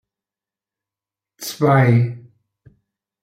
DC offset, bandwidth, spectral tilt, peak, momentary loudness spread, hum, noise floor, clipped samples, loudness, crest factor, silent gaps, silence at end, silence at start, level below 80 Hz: under 0.1%; 16 kHz; -7 dB/octave; -4 dBFS; 18 LU; none; -90 dBFS; under 0.1%; -16 LUFS; 18 dB; none; 1.05 s; 1.4 s; -62 dBFS